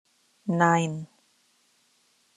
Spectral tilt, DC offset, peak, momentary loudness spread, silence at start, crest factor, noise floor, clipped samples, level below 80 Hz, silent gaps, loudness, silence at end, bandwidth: -6 dB/octave; under 0.1%; -6 dBFS; 18 LU; 0.45 s; 24 dB; -66 dBFS; under 0.1%; -74 dBFS; none; -25 LUFS; 1.3 s; 10.5 kHz